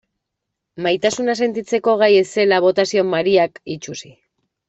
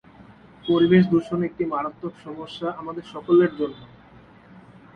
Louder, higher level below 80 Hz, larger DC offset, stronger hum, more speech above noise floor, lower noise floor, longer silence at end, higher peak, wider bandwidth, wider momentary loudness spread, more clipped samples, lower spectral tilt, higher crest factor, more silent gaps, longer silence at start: first, -17 LUFS vs -22 LUFS; about the same, -62 dBFS vs -58 dBFS; neither; neither; first, 62 dB vs 27 dB; first, -79 dBFS vs -49 dBFS; second, 0.65 s vs 1.1 s; first, -2 dBFS vs -6 dBFS; first, 8.2 kHz vs 6.2 kHz; second, 15 LU vs 18 LU; neither; second, -4 dB/octave vs -8.5 dB/octave; about the same, 16 dB vs 18 dB; neither; first, 0.75 s vs 0.2 s